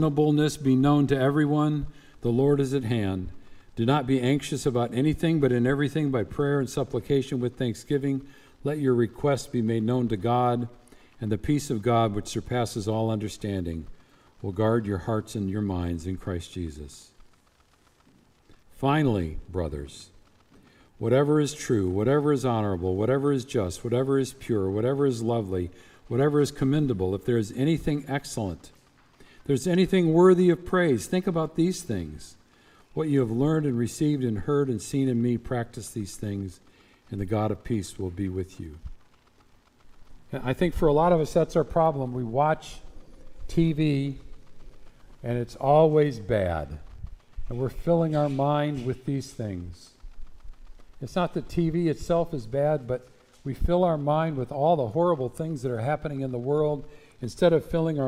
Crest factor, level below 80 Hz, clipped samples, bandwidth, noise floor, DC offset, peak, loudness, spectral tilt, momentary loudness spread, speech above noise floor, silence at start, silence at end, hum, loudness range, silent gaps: 18 dB; -46 dBFS; under 0.1%; 15.5 kHz; -62 dBFS; under 0.1%; -8 dBFS; -26 LUFS; -7 dB/octave; 13 LU; 37 dB; 0 s; 0 s; none; 7 LU; none